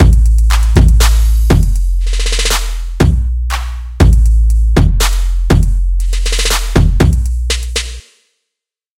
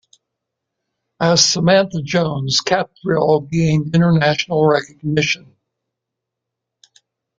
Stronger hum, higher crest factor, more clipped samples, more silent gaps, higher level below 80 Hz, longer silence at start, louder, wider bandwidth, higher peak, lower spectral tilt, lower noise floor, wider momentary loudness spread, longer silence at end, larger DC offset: neither; second, 10 dB vs 16 dB; first, 0.4% vs under 0.1%; neither; first, -12 dBFS vs -52 dBFS; second, 0 s vs 1.2 s; first, -13 LUFS vs -16 LUFS; first, 16 kHz vs 7.6 kHz; about the same, 0 dBFS vs -2 dBFS; about the same, -5 dB/octave vs -4.5 dB/octave; about the same, -79 dBFS vs -81 dBFS; about the same, 8 LU vs 7 LU; second, 1 s vs 2 s; neither